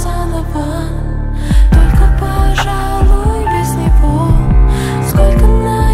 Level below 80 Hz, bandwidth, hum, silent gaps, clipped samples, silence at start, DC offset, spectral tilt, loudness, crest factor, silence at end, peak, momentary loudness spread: -12 dBFS; 14 kHz; none; none; under 0.1%; 0 s; under 0.1%; -6.5 dB/octave; -13 LUFS; 10 dB; 0 s; 0 dBFS; 8 LU